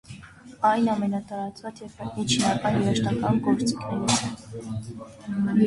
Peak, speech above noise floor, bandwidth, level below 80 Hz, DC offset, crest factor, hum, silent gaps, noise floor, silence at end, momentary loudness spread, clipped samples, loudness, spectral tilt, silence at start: -8 dBFS; 20 dB; 11.5 kHz; -54 dBFS; under 0.1%; 18 dB; none; none; -45 dBFS; 0 s; 16 LU; under 0.1%; -25 LUFS; -5 dB/octave; 0.1 s